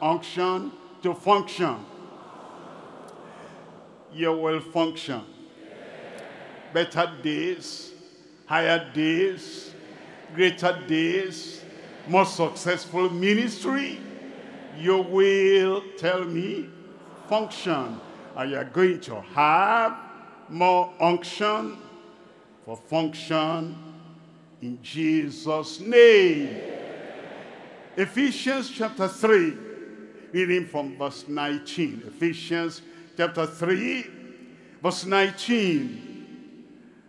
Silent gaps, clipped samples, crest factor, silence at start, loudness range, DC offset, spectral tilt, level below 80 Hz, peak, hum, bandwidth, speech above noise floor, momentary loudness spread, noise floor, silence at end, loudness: none; under 0.1%; 22 dB; 0 s; 9 LU; under 0.1%; -5 dB/octave; -78 dBFS; -4 dBFS; none; 12 kHz; 28 dB; 23 LU; -52 dBFS; 0.45 s; -24 LUFS